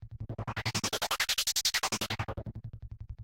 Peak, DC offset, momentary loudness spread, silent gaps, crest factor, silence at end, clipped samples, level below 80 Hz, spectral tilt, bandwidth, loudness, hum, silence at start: -16 dBFS; under 0.1%; 18 LU; none; 18 dB; 0 s; under 0.1%; -50 dBFS; -2 dB/octave; 17 kHz; -31 LUFS; none; 0 s